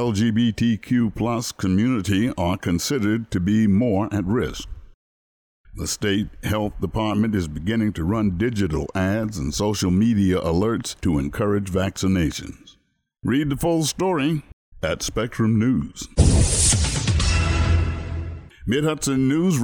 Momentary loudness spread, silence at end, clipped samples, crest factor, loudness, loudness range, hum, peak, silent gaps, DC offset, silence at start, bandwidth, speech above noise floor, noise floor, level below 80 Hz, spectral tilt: 8 LU; 0 s; under 0.1%; 18 dB; -22 LUFS; 4 LU; none; -4 dBFS; 4.94-5.64 s, 14.53-14.72 s; under 0.1%; 0 s; 20 kHz; 44 dB; -65 dBFS; -32 dBFS; -5 dB/octave